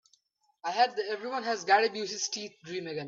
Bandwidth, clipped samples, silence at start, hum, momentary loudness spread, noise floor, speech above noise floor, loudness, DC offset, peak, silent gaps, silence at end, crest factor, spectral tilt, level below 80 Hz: 7.8 kHz; under 0.1%; 0.65 s; none; 13 LU; -70 dBFS; 40 dB; -30 LUFS; under 0.1%; -10 dBFS; none; 0 s; 20 dB; -2 dB/octave; -82 dBFS